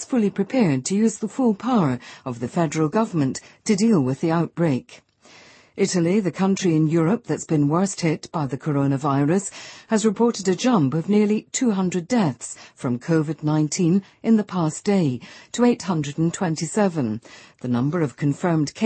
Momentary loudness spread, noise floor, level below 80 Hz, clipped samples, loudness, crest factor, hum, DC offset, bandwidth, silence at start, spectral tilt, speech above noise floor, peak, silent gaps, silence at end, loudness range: 8 LU; -50 dBFS; -62 dBFS; under 0.1%; -22 LUFS; 14 dB; none; under 0.1%; 8.8 kHz; 0 s; -6 dB/octave; 29 dB; -6 dBFS; none; 0 s; 2 LU